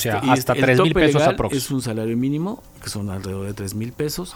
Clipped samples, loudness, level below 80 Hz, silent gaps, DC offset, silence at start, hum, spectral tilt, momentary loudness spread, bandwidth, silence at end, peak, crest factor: under 0.1%; -20 LUFS; -42 dBFS; none; under 0.1%; 0 s; none; -5.5 dB/octave; 13 LU; 19 kHz; 0 s; -2 dBFS; 18 dB